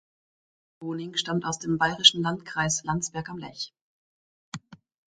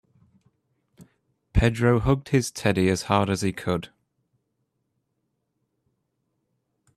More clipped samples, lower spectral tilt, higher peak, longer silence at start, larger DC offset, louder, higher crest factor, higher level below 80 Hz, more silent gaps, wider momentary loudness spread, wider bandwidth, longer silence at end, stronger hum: neither; second, -2.5 dB/octave vs -6 dB/octave; first, -2 dBFS vs -6 dBFS; second, 0.8 s vs 1 s; neither; about the same, -25 LUFS vs -24 LUFS; first, 28 dB vs 22 dB; second, -60 dBFS vs -40 dBFS; first, 3.81-4.52 s vs none; first, 23 LU vs 8 LU; second, 9.6 kHz vs 13.5 kHz; second, 0.35 s vs 3.1 s; neither